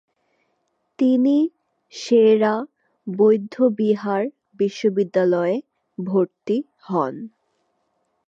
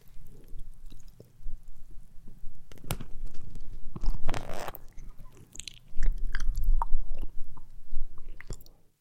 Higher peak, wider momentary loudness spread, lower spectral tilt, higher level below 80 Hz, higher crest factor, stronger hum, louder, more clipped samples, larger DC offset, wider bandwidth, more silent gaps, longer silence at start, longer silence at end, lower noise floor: about the same, -6 dBFS vs -6 dBFS; second, 17 LU vs 20 LU; first, -7 dB/octave vs -4.5 dB/octave; second, -78 dBFS vs -30 dBFS; about the same, 16 dB vs 18 dB; neither; first, -20 LUFS vs -40 LUFS; neither; neither; about the same, 7.8 kHz vs 8.2 kHz; neither; first, 1 s vs 0.1 s; first, 1 s vs 0.4 s; first, -71 dBFS vs -45 dBFS